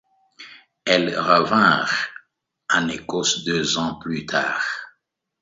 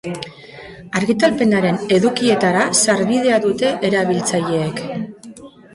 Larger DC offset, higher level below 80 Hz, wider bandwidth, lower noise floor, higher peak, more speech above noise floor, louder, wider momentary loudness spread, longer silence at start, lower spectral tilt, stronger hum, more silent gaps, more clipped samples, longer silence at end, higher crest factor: neither; about the same, -58 dBFS vs -54 dBFS; second, 8 kHz vs 11.5 kHz; first, -69 dBFS vs -38 dBFS; about the same, 0 dBFS vs -2 dBFS; first, 48 dB vs 22 dB; second, -20 LUFS vs -16 LUFS; second, 13 LU vs 17 LU; first, 0.4 s vs 0.05 s; about the same, -3 dB/octave vs -4 dB/octave; neither; neither; neither; first, 0.55 s vs 0.25 s; first, 22 dB vs 16 dB